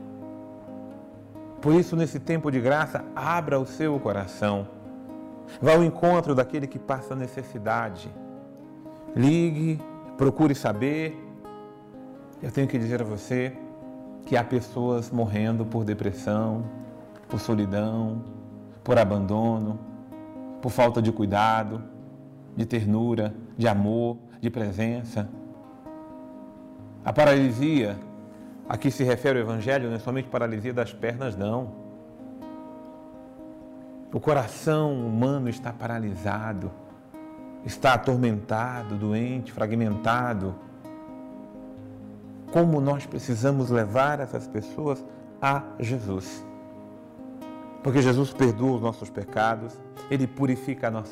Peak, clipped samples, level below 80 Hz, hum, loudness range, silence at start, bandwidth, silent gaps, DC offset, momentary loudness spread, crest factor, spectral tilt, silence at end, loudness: -12 dBFS; under 0.1%; -60 dBFS; none; 5 LU; 0 s; 15.5 kHz; none; under 0.1%; 21 LU; 16 dB; -7 dB/octave; 0 s; -26 LUFS